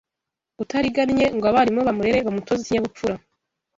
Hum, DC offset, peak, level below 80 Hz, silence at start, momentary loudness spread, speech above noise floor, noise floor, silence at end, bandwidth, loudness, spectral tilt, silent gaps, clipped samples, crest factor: none; under 0.1%; -4 dBFS; -50 dBFS; 0.6 s; 10 LU; 65 dB; -85 dBFS; 0.6 s; 7.8 kHz; -21 LUFS; -5.5 dB/octave; none; under 0.1%; 18 dB